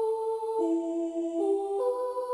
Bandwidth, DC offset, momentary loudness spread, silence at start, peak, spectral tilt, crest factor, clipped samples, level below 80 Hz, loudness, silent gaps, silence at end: 12 kHz; under 0.1%; 3 LU; 0 s; -18 dBFS; -5 dB/octave; 12 dB; under 0.1%; -74 dBFS; -30 LUFS; none; 0 s